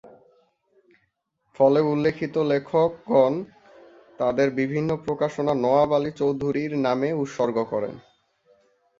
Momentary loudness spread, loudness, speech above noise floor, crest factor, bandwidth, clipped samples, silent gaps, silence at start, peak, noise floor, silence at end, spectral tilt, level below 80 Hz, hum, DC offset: 7 LU; -23 LUFS; 50 dB; 18 dB; 7.6 kHz; under 0.1%; none; 0.05 s; -6 dBFS; -72 dBFS; 1 s; -7.5 dB/octave; -60 dBFS; none; under 0.1%